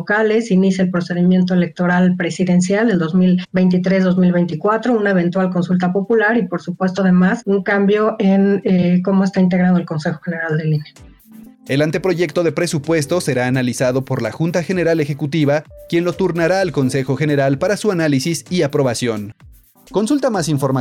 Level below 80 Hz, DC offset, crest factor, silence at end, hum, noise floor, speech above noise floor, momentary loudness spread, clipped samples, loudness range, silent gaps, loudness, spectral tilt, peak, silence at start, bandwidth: -52 dBFS; under 0.1%; 10 dB; 0 s; none; -41 dBFS; 26 dB; 6 LU; under 0.1%; 3 LU; none; -16 LUFS; -6.5 dB/octave; -6 dBFS; 0 s; 13 kHz